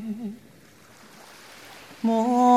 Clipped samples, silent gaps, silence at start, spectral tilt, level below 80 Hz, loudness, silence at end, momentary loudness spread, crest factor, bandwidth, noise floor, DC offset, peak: under 0.1%; none; 0 s; -6 dB/octave; -72 dBFS; -25 LUFS; 0 s; 25 LU; 18 dB; 14.5 kHz; -52 dBFS; under 0.1%; -6 dBFS